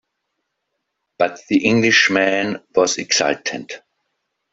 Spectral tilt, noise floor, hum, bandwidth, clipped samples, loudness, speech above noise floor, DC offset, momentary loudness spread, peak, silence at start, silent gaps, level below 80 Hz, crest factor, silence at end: -3 dB/octave; -76 dBFS; none; 8 kHz; under 0.1%; -17 LUFS; 58 dB; under 0.1%; 14 LU; -2 dBFS; 1.2 s; none; -60 dBFS; 18 dB; 0.75 s